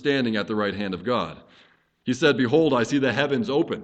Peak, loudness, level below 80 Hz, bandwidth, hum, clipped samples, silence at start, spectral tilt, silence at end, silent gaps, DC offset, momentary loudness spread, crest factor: -4 dBFS; -23 LUFS; -60 dBFS; 8.8 kHz; none; under 0.1%; 0 s; -5.5 dB/octave; 0 s; none; under 0.1%; 9 LU; 18 dB